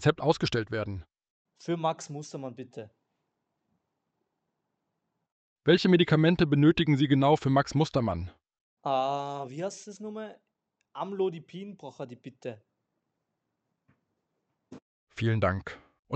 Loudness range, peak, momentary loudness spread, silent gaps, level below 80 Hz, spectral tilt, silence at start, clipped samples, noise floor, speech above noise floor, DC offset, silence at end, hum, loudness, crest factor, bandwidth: 21 LU; -10 dBFS; 21 LU; 1.30-1.45 s, 5.32-5.56 s, 8.61-8.77 s, 14.82-15.07 s, 15.99-16.03 s; -58 dBFS; -6.5 dB/octave; 0 s; under 0.1%; -83 dBFS; 55 dB; under 0.1%; 0 s; none; -27 LUFS; 20 dB; 8.6 kHz